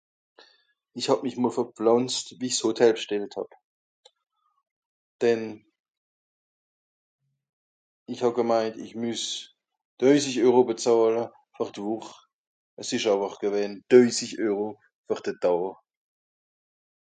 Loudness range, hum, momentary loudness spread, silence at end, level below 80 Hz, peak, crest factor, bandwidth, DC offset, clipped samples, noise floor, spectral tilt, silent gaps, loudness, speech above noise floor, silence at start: 9 LU; none; 14 LU; 1.4 s; -78 dBFS; -4 dBFS; 22 dB; 9.4 kHz; under 0.1%; under 0.1%; -65 dBFS; -4 dB/octave; 3.64-4.03 s, 4.71-5.19 s, 5.79-7.19 s, 7.49-8.06 s, 9.85-9.97 s, 12.33-12.77 s, 14.95-15.04 s; -25 LUFS; 40 dB; 0.95 s